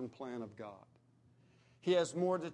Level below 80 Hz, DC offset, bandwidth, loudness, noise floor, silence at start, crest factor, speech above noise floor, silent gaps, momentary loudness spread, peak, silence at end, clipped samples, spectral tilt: -84 dBFS; under 0.1%; 10.5 kHz; -37 LUFS; -68 dBFS; 0 s; 18 dB; 31 dB; none; 17 LU; -22 dBFS; 0 s; under 0.1%; -5.5 dB/octave